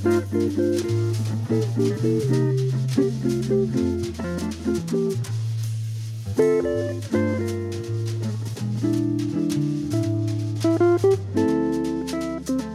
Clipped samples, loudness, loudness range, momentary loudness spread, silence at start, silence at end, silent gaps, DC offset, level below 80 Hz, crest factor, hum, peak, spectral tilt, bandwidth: under 0.1%; -24 LUFS; 3 LU; 8 LU; 0 s; 0 s; none; under 0.1%; -50 dBFS; 14 dB; none; -8 dBFS; -7.5 dB/octave; 14.5 kHz